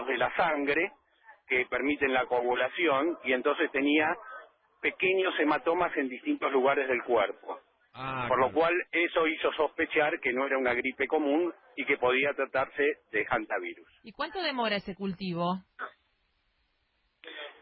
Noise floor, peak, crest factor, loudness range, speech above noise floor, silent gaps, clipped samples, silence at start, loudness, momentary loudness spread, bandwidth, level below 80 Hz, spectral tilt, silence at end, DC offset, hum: -75 dBFS; -14 dBFS; 16 dB; 5 LU; 46 dB; none; under 0.1%; 0 s; -29 LUFS; 11 LU; 5.8 kHz; -66 dBFS; -9 dB/octave; 0.1 s; under 0.1%; none